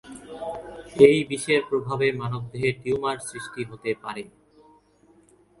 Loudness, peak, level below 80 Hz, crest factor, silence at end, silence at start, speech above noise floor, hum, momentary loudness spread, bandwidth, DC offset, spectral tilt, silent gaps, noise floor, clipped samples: -24 LUFS; -2 dBFS; -60 dBFS; 24 dB; 1.35 s; 0.05 s; 35 dB; none; 20 LU; 11.5 kHz; under 0.1%; -5.5 dB/octave; none; -58 dBFS; under 0.1%